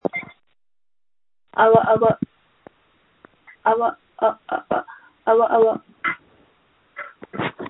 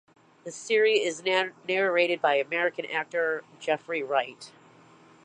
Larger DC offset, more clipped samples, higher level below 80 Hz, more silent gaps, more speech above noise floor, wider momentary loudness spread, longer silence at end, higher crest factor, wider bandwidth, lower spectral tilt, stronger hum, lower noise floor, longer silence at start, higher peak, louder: neither; neither; first, -62 dBFS vs -84 dBFS; neither; first, over 72 dB vs 28 dB; first, 19 LU vs 16 LU; second, 0 s vs 0.75 s; about the same, 22 dB vs 20 dB; second, 4 kHz vs 10.5 kHz; first, -10.5 dB/octave vs -3 dB/octave; neither; first, under -90 dBFS vs -55 dBFS; second, 0.05 s vs 0.45 s; first, 0 dBFS vs -8 dBFS; first, -20 LUFS vs -26 LUFS